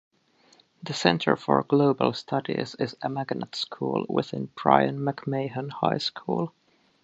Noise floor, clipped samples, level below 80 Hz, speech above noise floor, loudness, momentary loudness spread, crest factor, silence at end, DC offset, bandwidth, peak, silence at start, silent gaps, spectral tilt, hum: -61 dBFS; under 0.1%; -68 dBFS; 35 dB; -26 LUFS; 10 LU; 24 dB; 0.55 s; under 0.1%; 8.2 kHz; -2 dBFS; 0.85 s; none; -6 dB/octave; none